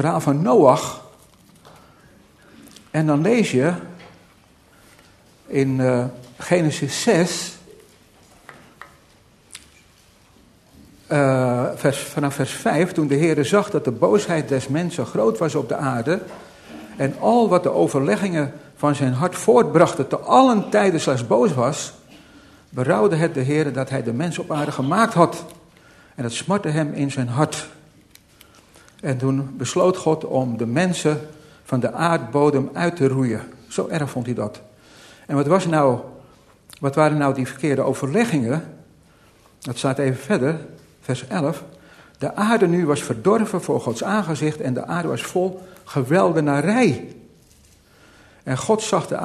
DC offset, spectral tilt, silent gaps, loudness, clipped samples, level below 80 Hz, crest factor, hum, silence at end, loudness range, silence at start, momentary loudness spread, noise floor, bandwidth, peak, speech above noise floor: under 0.1%; -6 dB/octave; none; -20 LUFS; under 0.1%; -60 dBFS; 20 dB; none; 0 s; 6 LU; 0 s; 12 LU; -53 dBFS; 13.5 kHz; 0 dBFS; 34 dB